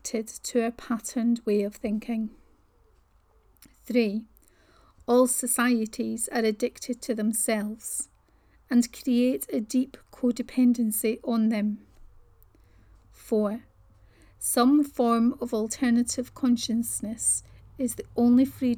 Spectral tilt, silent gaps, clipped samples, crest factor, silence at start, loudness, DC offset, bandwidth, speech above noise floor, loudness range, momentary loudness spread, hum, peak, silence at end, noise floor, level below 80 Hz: -4 dB/octave; none; under 0.1%; 18 dB; 0.05 s; -26 LUFS; under 0.1%; 18 kHz; 36 dB; 6 LU; 10 LU; none; -10 dBFS; 0 s; -62 dBFS; -58 dBFS